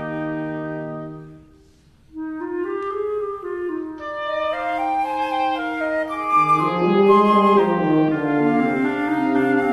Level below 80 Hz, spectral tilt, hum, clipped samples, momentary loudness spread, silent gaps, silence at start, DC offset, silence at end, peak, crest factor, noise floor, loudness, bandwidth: -56 dBFS; -7.5 dB/octave; none; under 0.1%; 15 LU; none; 0 s; under 0.1%; 0 s; -4 dBFS; 16 dB; -52 dBFS; -20 LUFS; 12 kHz